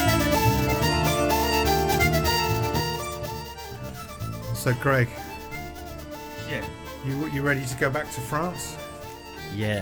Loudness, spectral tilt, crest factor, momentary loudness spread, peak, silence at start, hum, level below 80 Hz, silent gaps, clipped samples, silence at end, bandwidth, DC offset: -25 LUFS; -4.5 dB/octave; 18 dB; 16 LU; -8 dBFS; 0 s; none; -38 dBFS; none; under 0.1%; 0 s; over 20 kHz; under 0.1%